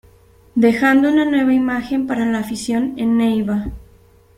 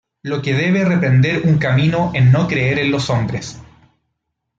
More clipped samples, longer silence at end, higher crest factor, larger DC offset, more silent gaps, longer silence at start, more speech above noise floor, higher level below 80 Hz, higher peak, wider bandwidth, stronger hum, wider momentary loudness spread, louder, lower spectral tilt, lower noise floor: neither; second, 0.55 s vs 0.95 s; about the same, 16 dB vs 12 dB; neither; neither; first, 0.55 s vs 0.25 s; second, 33 dB vs 59 dB; about the same, -44 dBFS vs -48 dBFS; about the same, -2 dBFS vs -4 dBFS; first, 15.5 kHz vs 7.8 kHz; neither; about the same, 9 LU vs 10 LU; about the same, -17 LUFS vs -16 LUFS; second, -5.5 dB/octave vs -7 dB/octave; second, -49 dBFS vs -74 dBFS